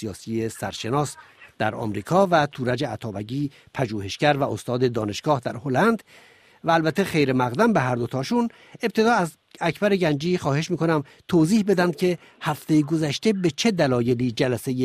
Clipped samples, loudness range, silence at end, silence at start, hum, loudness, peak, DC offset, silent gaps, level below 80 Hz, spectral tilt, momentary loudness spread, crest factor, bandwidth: under 0.1%; 3 LU; 0 s; 0 s; none; -23 LUFS; -4 dBFS; under 0.1%; none; -58 dBFS; -6 dB/octave; 9 LU; 18 dB; 15 kHz